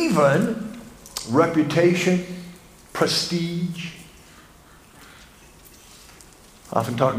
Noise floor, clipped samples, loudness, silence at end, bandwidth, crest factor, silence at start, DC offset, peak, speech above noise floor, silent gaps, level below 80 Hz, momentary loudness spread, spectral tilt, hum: -49 dBFS; under 0.1%; -22 LUFS; 0 s; 15.5 kHz; 20 dB; 0 s; under 0.1%; -4 dBFS; 29 dB; none; -56 dBFS; 17 LU; -5.5 dB/octave; none